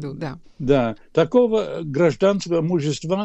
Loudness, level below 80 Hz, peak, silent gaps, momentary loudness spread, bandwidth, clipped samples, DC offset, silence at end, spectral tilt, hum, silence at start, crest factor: -20 LUFS; -46 dBFS; -4 dBFS; none; 12 LU; 8.4 kHz; under 0.1%; under 0.1%; 0 s; -6.5 dB/octave; none; 0 s; 16 dB